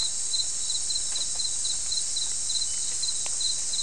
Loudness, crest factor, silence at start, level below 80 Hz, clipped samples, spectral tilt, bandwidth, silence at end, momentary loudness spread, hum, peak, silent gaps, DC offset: -26 LUFS; 16 dB; 0 s; -54 dBFS; under 0.1%; 2 dB/octave; 12 kHz; 0 s; 1 LU; none; -12 dBFS; none; 2%